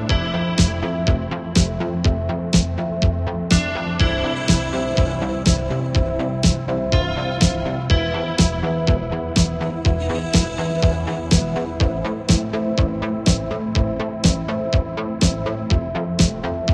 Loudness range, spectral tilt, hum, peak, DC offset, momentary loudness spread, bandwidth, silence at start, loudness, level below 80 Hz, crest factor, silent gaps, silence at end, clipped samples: 1 LU; -5.5 dB/octave; none; -2 dBFS; under 0.1%; 4 LU; 11.5 kHz; 0 s; -20 LUFS; -26 dBFS; 16 dB; none; 0 s; under 0.1%